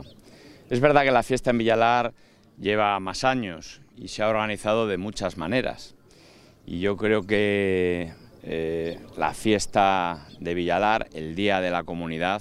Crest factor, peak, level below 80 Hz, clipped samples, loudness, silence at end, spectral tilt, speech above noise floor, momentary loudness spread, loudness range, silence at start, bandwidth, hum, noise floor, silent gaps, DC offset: 22 dB; -4 dBFS; -50 dBFS; under 0.1%; -24 LUFS; 0 s; -5 dB/octave; 28 dB; 13 LU; 4 LU; 0 s; 14 kHz; none; -53 dBFS; none; under 0.1%